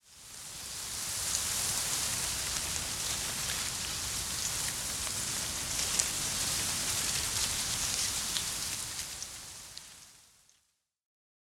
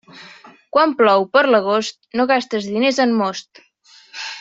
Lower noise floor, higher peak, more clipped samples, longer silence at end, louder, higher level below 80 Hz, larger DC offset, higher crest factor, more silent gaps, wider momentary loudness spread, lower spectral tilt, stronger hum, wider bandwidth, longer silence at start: first, -76 dBFS vs -48 dBFS; about the same, -4 dBFS vs -2 dBFS; neither; first, 1.25 s vs 0 s; second, -31 LUFS vs -17 LUFS; first, -54 dBFS vs -66 dBFS; neither; first, 30 dB vs 16 dB; neither; about the same, 12 LU vs 14 LU; second, 0 dB/octave vs -4 dB/octave; neither; first, 17.5 kHz vs 7.8 kHz; about the same, 0.05 s vs 0.15 s